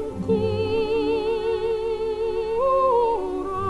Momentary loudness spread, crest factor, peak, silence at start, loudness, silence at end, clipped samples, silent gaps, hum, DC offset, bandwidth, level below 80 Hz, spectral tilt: 6 LU; 12 dB; -10 dBFS; 0 s; -23 LUFS; 0 s; under 0.1%; none; none; under 0.1%; 11.5 kHz; -44 dBFS; -7 dB/octave